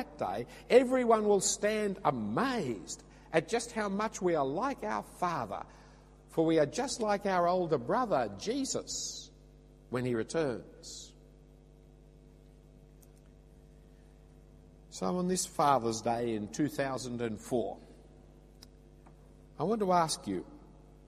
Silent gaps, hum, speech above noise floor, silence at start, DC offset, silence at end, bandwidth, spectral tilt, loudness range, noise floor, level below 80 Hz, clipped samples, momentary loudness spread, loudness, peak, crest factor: none; none; 25 dB; 0 s; under 0.1%; 0.35 s; 15 kHz; -4.5 dB/octave; 8 LU; -57 dBFS; -58 dBFS; under 0.1%; 14 LU; -32 LUFS; -10 dBFS; 24 dB